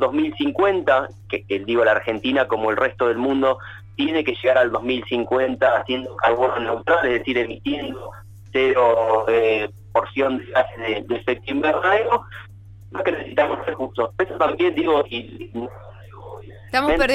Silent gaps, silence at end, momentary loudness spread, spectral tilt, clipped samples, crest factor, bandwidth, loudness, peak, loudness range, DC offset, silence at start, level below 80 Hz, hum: none; 0 s; 14 LU; -6 dB/octave; under 0.1%; 16 dB; 13 kHz; -20 LUFS; -6 dBFS; 3 LU; under 0.1%; 0 s; -46 dBFS; none